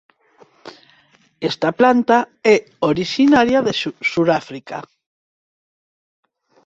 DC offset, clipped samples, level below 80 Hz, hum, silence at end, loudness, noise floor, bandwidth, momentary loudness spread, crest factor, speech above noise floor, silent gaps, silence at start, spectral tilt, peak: under 0.1%; under 0.1%; -56 dBFS; none; 1.85 s; -16 LUFS; -55 dBFS; 8 kHz; 15 LU; 18 dB; 39 dB; none; 0.65 s; -5.5 dB/octave; -2 dBFS